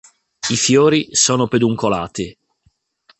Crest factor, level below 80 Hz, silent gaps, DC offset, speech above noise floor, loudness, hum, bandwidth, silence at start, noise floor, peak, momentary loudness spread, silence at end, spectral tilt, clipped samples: 16 dB; -50 dBFS; none; under 0.1%; 46 dB; -16 LUFS; none; 8.8 kHz; 0.45 s; -62 dBFS; -2 dBFS; 13 LU; 0.9 s; -3.5 dB/octave; under 0.1%